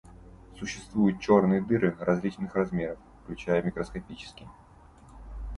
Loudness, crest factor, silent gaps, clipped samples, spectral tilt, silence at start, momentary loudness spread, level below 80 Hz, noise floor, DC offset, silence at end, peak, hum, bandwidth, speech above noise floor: -28 LUFS; 20 dB; none; under 0.1%; -7 dB/octave; 0.05 s; 21 LU; -48 dBFS; -53 dBFS; under 0.1%; 0 s; -8 dBFS; none; 11 kHz; 26 dB